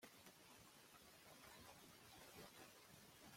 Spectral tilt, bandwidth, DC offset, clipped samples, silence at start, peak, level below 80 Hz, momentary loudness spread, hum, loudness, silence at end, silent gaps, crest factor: -2.5 dB/octave; 16.5 kHz; under 0.1%; under 0.1%; 0 s; -48 dBFS; -84 dBFS; 4 LU; none; -63 LUFS; 0 s; none; 16 dB